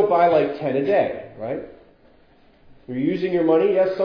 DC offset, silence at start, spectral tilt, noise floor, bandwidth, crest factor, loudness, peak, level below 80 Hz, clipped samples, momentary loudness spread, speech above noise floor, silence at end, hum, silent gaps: under 0.1%; 0 s; -9 dB/octave; -54 dBFS; 5.4 kHz; 14 dB; -21 LUFS; -6 dBFS; -58 dBFS; under 0.1%; 15 LU; 34 dB; 0 s; none; none